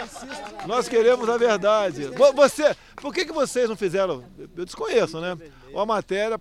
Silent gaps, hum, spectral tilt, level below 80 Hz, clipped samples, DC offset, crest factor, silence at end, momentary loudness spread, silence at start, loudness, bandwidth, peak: none; none; -4 dB/octave; -54 dBFS; under 0.1%; under 0.1%; 18 dB; 0 s; 17 LU; 0 s; -22 LUFS; 14 kHz; -4 dBFS